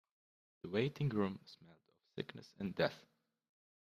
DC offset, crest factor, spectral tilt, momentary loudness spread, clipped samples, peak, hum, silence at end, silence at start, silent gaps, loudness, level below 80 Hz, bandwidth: under 0.1%; 22 dB; -7.5 dB/octave; 20 LU; under 0.1%; -20 dBFS; none; 0.85 s; 0.65 s; none; -40 LUFS; -76 dBFS; 14 kHz